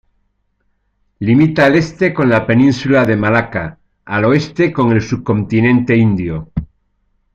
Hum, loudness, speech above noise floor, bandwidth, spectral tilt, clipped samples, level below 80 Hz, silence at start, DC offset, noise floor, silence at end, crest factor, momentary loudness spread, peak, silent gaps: none; -13 LUFS; 51 dB; 7.8 kHz; -7.5 dB/octave; under 0.1%; -40 dBFS; 1.2 s; under 0.1%; -63 dBFS; 0.7 s; 14 dB; 11 LU; 0 dBFS; none